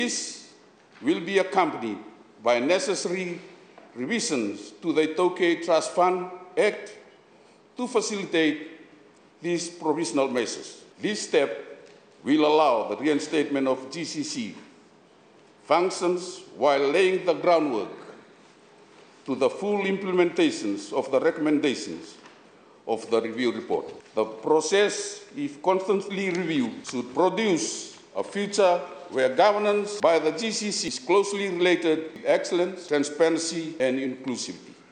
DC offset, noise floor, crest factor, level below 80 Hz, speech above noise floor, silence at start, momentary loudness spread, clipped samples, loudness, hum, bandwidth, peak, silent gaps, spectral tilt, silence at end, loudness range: under 0.1%; -55 dBFS; 18 dB; -76 dBFS; 31 dB; 0 s; 13 LU; under 0.1%; -25 LUFS; none; 9.8 kHz; -8 dBFS; none; -4 dB/octave; 0.2 s; 4 LU